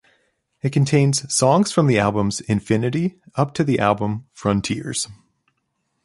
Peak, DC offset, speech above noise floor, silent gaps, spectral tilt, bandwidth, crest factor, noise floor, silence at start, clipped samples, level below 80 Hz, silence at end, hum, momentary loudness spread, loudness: -2 dBFS; under 0.1%; 53 dB; none; -5.5 dB/octave; 11.5 kHz; 18 dB; -72 dBFS; 0.65 s; under 0.1%; -50 dBFS; 0.9 s; none; 9 LU; -20 LUFS